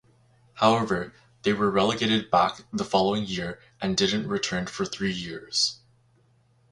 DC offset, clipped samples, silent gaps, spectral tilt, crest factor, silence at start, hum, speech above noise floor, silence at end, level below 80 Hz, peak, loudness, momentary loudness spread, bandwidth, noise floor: under 0.1%; under 0.1%; none; -4 dB/octave; 22 dB; 0.55 s; none; 37 dB; 0.95 s; -56 dBFS; -6 dBFS; -25 LUFS; 10 LU; 11.5 kHz; -63 dBFS